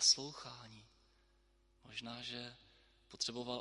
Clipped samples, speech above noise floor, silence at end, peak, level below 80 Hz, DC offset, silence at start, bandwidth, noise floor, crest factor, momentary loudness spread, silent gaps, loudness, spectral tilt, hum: under 0.1%; 32 dB; 0 s; -18 dBFS; -74 dBFS; under 0.1%; 0 s; 11.5 kHz; -73 dBFS; 26 dB; 22 LU; none; -40 LUFS; -1 dB/octave; none